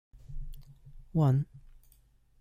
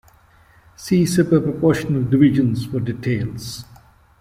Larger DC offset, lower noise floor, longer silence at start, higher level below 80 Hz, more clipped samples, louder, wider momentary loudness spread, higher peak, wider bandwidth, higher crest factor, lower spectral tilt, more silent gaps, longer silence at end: neither; first, -63 dBFS vs -52 dBFS; second, 0.15 s vs 0.8 s; about the same, -46 dBFS vs -48 dBFS; neither; second, -30 LUFS vs -18 LUFS; first, 23 LU vs 16 LU; second, -14 dBFS vs -2 dBFS; second, 14.5 kHz vs 16 kHz; about the same, 18 dB vs 16 dB; first, -10 dB/octave vs -7 dB/octave; neither; first, 0.8 s vs 0.55 s